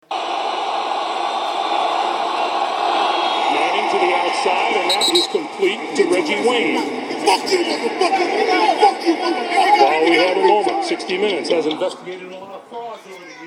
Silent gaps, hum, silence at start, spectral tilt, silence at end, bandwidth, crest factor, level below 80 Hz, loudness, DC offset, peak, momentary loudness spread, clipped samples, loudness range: none; none; 0.1 s; -2.5 dB/octave; 0 s; 17 kHz; 18 dB; -70 dBFS; -17 LUFS; under 0.1%; 0 dBFS; 10 LU; under 0.1%; 4 LU